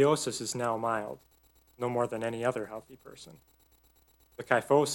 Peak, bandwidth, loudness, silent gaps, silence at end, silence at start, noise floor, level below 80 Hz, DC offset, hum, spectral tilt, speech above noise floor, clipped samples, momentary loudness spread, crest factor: -8 dBFS; 17 kHz; -31 LUFS; none; 0 s; 0 s; -65 dBFS; -68 dBFS; under 0.1%; none; -4.5 dB/octave; 34 dB; under 0.1%; 24 LU; 24 dB